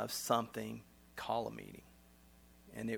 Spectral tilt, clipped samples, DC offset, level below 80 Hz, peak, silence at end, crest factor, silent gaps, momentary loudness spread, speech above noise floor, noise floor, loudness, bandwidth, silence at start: -4 dB/octave; under 0.1%; under 0.1%; -68 dBFS; -18 dBFS; 0 s; 24 dB; none; 18 LU; 24 dB; -63 dBFS; -40 LUFS; over 20 kHz; 0 s